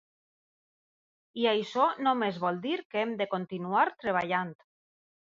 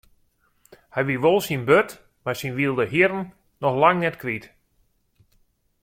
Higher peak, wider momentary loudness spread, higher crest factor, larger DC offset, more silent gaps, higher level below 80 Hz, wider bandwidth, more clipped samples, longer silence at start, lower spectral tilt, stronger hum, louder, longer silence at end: second, -12 dBFS vs -2 dBFS; second, 6 LU vs 13 LU; about the same, 20 dB vs 22 dB; neither; first, 2.85-2.90 s vs none; second, -76 dBFS vs -60 dBFS; second, 7.6 kHz vs 16.5 kHz; neither; first, 1.35 s vs 0.95 s; about the same, -6 dB/octave vs -6 dB/octave; neither; second, -29 LUFS vs -22 LUFS; second, 0.75 s vs 1.35 s